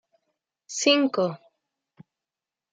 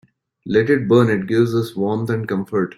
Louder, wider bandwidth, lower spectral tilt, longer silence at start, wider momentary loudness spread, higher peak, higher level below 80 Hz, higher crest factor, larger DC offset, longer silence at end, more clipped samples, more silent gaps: second, -23 LUFS vs -18 LUFS; second, 9.4 kHz vs 15 kHz; second, -3 dB/octave vs -8 dB/octave; first, 0.7 s vs 0.45 s; first, 16 LU vs 7 LU; second, -6 dBFS vs -2 dBFS; second, -82 dBFS vs -56 dBFS; first, 22 dB vs 16 dB; neither; first, 1.35 s vs 0.05 s; neither; neither